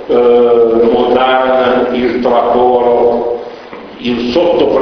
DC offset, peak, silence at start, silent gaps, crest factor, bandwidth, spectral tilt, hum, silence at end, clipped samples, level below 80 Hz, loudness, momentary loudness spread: under 0.1%; 0 dBFS; 0 s; none; 10 dB; 6.2 kHz; -6.5 dB/octave; none; 0 s; under 0.1%; -42 dBFS; -10 LUFS; 12 LU